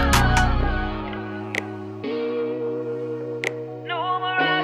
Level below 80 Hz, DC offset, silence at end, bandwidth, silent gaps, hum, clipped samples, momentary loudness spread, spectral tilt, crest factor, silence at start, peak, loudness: -30 dBFS; under 0.1%; 0 s; 15.5 kHz; none; none; under 0.1%; 11 LU; -4.5 dB/octave; 22 dB; 0 s; -2 dBFS; -25 LUFS